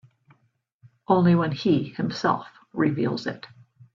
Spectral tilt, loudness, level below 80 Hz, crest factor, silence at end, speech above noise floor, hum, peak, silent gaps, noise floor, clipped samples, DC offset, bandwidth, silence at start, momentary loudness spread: -7.5 dB/octave; -24 LUFS; -62 dBFS; 18 dB; 0.5 s; 46 dB; none; -6 dBFS; none; -69 dBFS; under 0.1%; under 0.1%; 7.2 kHz; 1.1 s; 13 LU